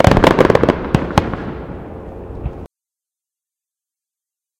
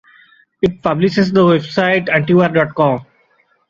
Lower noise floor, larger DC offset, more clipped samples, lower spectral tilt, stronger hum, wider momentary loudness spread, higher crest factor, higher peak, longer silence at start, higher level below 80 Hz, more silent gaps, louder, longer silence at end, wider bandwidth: first, -87 dBFS vs -57 dBFS; neither; first, 0.3% vs under 0.1%; about the same, -6.5 dB/octave vs -7.5 dB/octave; neither; first, 21 LU vs 6 LU; about the same, 18 dB vs 14 dB; about the same, 0 dBFS vs 0 dBFS; second, 0 s vs 0.6 s; first, -30 dBFS vs -50 dBFS; neither; about the same, -14 LUFS vs -14 LUFS; first, 1.95 s vs 0.65 s; first, 17 kHz vs 7.4 kHz